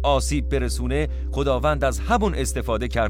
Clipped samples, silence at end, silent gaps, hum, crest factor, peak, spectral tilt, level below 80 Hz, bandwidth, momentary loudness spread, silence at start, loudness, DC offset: under 0.1%; 0 s; none; none; 14 dB; -6 dBFS; -5 dB/octave; -26 dBFS; 16 kHz; 4 LU; 0 s; -23 LUFS; under 0.1%